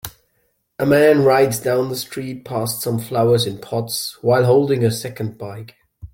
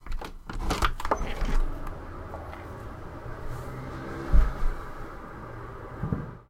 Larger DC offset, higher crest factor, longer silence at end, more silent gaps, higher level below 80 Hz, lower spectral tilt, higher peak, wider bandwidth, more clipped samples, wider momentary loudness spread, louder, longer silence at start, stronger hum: neither; second, 16 dB vs 22 dB; about the same, 0.05 s vs 0.1 s; neither; second, -54 dBFS vs -30 dBFS; about the same, -5.5 dB/octave vs -5.5 dB/octave; first, -2 dBFS vs -6 dBFS; first, 17 kHz vs 13.5 kHz; neither; about the same, 15 LU vs 13 LU; first, -18 LUFS vs -34 LUFS; about the same, 0.05 s vs 0 s; neither